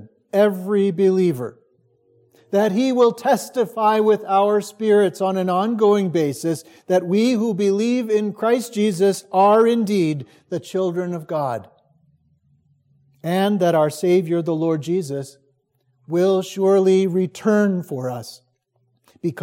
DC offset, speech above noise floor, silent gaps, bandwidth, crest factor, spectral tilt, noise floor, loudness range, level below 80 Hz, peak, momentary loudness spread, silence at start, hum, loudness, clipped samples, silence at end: under 0.1%; 48 dB; none; 16.5 kHz; 16 dB; -6.5 dB/octave; -67 dBFS; 4 LU; -74 dBFS; -4 dBFS; 11 LU; 0 s; none; -19 LUFS; under 0.1%; 0 s